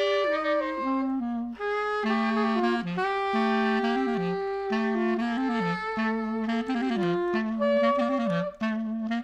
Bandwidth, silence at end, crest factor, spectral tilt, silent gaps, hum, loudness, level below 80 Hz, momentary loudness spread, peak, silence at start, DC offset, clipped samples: 8.4 kHz; 0 s; 14 dB; -6.5 dB/octave; none; none; -27 LUFS; -60 dBFS; 5 LU; -14 dBFS; 0 s; under 0.1%; under 0.1%